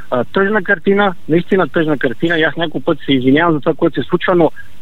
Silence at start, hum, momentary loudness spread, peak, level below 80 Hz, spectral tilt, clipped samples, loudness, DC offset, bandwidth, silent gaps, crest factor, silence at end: 0 s; none; 5 LU; 0 dBFS; -48 dBFS; -8 dB/octave; under 0.1%; -14 LUFS; 6%; 7.4 kHz; none; 14 dB; 0.2 s